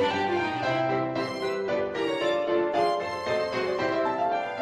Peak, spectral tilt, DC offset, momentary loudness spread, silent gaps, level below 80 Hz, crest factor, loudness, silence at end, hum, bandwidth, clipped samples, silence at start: -14 dBFS; -5.5 dB/octave; under 0.1%; 4 LU; none; -64 dBFS; 14 dB; -27 LUFS; 0 s; none; 12 kHz; under 0.1%; 0 s